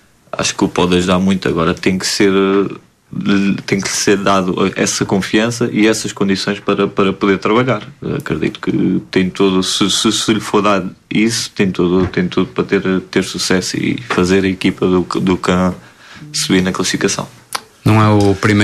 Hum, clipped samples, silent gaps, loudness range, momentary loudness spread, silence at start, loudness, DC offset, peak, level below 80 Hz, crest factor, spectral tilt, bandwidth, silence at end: none; under 0.1%; none; 1 LU; 7 LU; 0.35 s; -15 LUFS; under 0.1%; 0 dBFS; -44 dBFS; 14 dB; -4.5 dB/octave; 14 kHz; 0 s